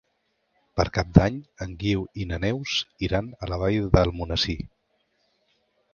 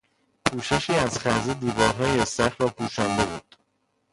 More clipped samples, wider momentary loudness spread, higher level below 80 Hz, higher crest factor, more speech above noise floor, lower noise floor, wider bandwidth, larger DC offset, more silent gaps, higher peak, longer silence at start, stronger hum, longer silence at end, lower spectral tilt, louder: neither; first, 13 LU vs 5 LU; first, -36 dBFS vs -48 dBFS; about the same, 26 dB vs 26 dB; about the same, 49 dB vs 47 dB; about the same, -73 dBFS vs -72 dBFS; second, 7 kHz vs 11.5 kHz; neither; neither; about the same, 0 dBFS vs 0 dBFS; first, 0.75 s vs 0.45 s; neither; first, 1.25 s vs 0.75 s; first, -6 dB/octave vs -4.5 dB/octave; about the same, -25 LUFS vs -24 LUFS